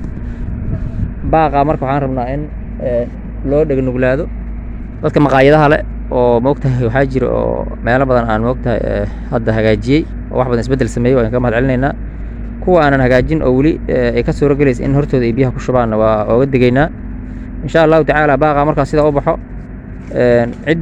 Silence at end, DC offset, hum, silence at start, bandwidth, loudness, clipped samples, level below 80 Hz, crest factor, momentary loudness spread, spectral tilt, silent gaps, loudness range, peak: 0 s; under 0.1%; none; 0 s; 9.4 kHz; -13 LUFS; 0.1%; -24 dBFS; 14 dB; 14 LU; -8 dB/octave; none; 3 LU; 0 dBFS